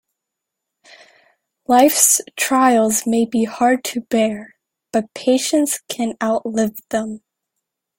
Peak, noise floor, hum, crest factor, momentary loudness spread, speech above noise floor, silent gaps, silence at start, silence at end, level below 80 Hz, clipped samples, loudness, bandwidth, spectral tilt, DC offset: 0 dBFS; -81 dBFS; none; 18 dB; 11 LU; 64 dB; none; 1.7 s; 0.8 s; -62 dBFS; under 0.1%; -17 LUFS; 17 kHz; -2.5 dB/octave; under 0.1%